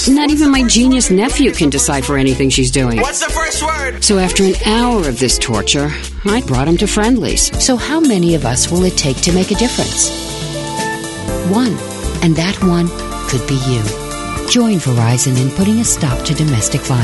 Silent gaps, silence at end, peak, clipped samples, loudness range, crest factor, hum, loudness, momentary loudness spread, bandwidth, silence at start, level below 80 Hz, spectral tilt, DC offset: none; 0 s; 0 dBFS; under 0.1%; 4 LU; 14 dB; none; -13 LUFS; 8 LU; 12 kHz; 0 s; -26 dBFS; -4 dB/octave; under 0.1%